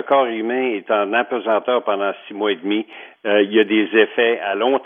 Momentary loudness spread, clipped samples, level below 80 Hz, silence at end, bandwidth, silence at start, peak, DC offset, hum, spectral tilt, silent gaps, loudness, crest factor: 8 LU; under 0.1%; -82 dBFS; 0 s; 3.7 kHz; 0 s; -2 dBFS; under 0.1%; none; -7.5 dB/octave; none; -19 LUFS; 16 dB